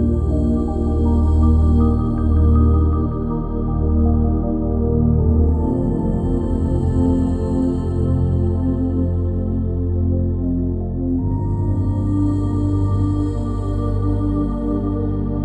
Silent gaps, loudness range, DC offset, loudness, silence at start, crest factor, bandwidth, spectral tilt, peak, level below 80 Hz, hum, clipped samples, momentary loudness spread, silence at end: none; 3 LU; under 0.1%; -19 LUFS; 0 s; 14 dB; 4.3 kHz; -11 dB/octave; -4 dBFS; -22 dBFS; none; under 0.1%; 6 LU; 0 s